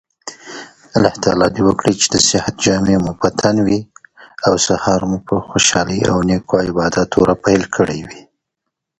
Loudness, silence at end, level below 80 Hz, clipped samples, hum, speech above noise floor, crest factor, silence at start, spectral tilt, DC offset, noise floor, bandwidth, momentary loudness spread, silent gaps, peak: -15 LUFS; 0.8 s; -40 dBFS; under 0.1%; none; 63 dB; 16 dB; 0.25 s; -4 dB/octave; under 0.1%; -78 dBFS; 11 kHz; 10 LU; none; 0 dBFS